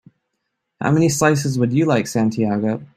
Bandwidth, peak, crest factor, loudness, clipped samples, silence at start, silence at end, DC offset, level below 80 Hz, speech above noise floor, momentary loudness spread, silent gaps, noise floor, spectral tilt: 15.5 kHz; -2 dBFS; 16 dB; -18 LUFS; under 0.1%; 0.8 s; 0.1 s; under 0.1%; -54 dBFS; 58 dB; 5 LU; none; -76 dBFS; -6 dB/octave